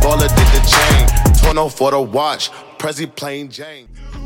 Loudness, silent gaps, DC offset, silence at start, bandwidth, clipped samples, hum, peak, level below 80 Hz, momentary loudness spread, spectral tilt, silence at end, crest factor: -14 LUFS; none; under 0.1%; 0 s; 17 kHz; under 0.1%; none; 0 dBFS; -16 dBFS; 16 LU; -4 dB/octave; 0 s; 14 dB